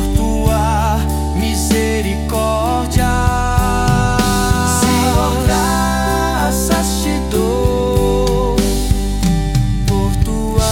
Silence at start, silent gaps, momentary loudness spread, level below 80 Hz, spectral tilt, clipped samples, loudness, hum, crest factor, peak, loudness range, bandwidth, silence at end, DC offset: 0 s; none; 3 LU; -20 dBFS; -5 dB/octave; under 0.1%; -15 LUFS; none; 12 dB; -2 dBFS; 2 LU; 18 kHz; 0 s; under 0.1%